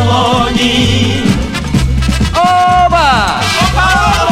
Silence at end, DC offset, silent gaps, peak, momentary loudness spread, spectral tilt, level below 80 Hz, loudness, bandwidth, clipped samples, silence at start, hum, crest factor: 0 s; under 0.1%; none; 0 dBFS; 5 LU; -4.5 dB/octave; -20 dBFS; -10 LUFS; 16 kHz; under 0.1%; 0 s; none; 10 dB